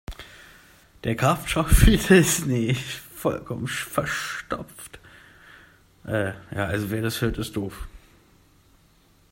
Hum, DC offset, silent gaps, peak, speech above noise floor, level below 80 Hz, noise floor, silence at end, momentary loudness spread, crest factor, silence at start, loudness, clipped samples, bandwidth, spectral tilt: none; under 0.1%; none; -2 dBFS; 36 dB; -32 dBFS; -58 dBFS; 1.35 s; 24 LU; 24 dB; 0.1 s; -24 LUFS; under 0.1%; 16.5 kHz; -5 dB/octave